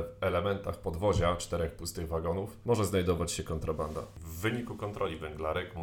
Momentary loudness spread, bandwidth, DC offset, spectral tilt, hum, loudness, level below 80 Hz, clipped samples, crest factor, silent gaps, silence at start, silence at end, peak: 8 LU; 18.5 kHz; under 0.1%; -5.5 dB/octave; none; -33 LUFS; -46 dBFS; under 0.1%; 20 dB; none; 0 s; 0 s; -14 dBFS